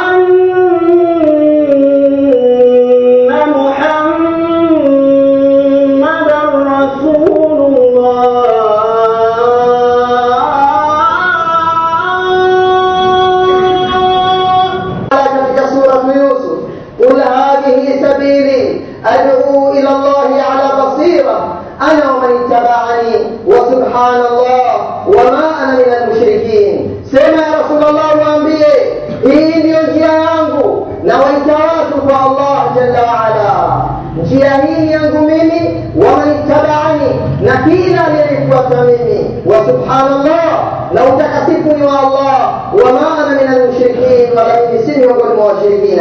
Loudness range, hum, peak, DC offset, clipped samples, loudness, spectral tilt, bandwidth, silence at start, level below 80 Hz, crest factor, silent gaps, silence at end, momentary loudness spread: 2 LU; none; 0 dBFS; under 0.1%; 0.8%; -9 LUFS; -7 dB/octave; 6.8 kHz; 0 s; -40 dBFS; 8 dB; none; 0 s; 4 LU